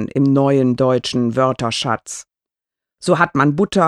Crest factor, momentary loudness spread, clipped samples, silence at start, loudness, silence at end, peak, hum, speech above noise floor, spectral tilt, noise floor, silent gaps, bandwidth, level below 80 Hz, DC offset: 16 dB; 10 LU; under 0.1%; 0 s; -17 LUFS; 0 s; 0 dBFS; none; 70 dB; -6 dB/octave; -86 dBFS; none; 12 kHz; -54 dBFS; under 0.1%